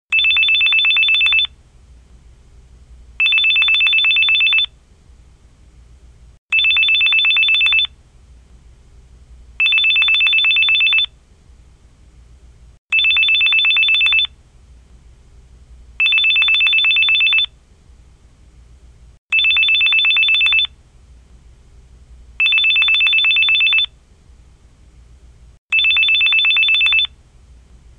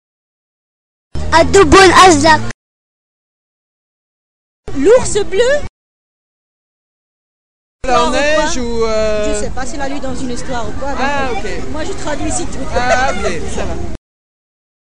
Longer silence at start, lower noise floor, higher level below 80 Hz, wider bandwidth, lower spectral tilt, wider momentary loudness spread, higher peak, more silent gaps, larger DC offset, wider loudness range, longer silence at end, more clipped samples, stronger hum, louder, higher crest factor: second, 0.1 s vs 1.1 s; second, -46 dBFS vs under -90 dBFS; second, -46 dBFS vs -30 dBFS; second, 9.4 kHz vs 11 kHz; second, 0 dB/octave vs -3.5 dB/octave; second, 6 LU vs 17 LU; about the same, -2 dBFS vs 0 dBFS; second, 6.38-6.49 s, 12.78-12.89 s, 19.18-19.29 s, 25.58-25.69 s vs 2.54-4.63 s, 5.69-7.79 s; second, under 0.1% vs 10%; second, 1 LU vs 9 LU; about the same, 0.9 s vs 0.95 s; neither; neither; about the same, -11 LUFS vs -13 LUFS; about the same, 16 dB vs 16 dB